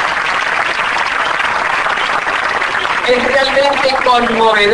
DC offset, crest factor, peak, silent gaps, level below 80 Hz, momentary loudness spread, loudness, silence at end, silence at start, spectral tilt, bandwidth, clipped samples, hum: under 0.1%; 14 dB; 0 dBFS; none; -42 dBFS; 3 LU; -12 LUFS; 0 s; 0 s; -2.5 dB/octave; 10.5 kHz; under 0.1%; none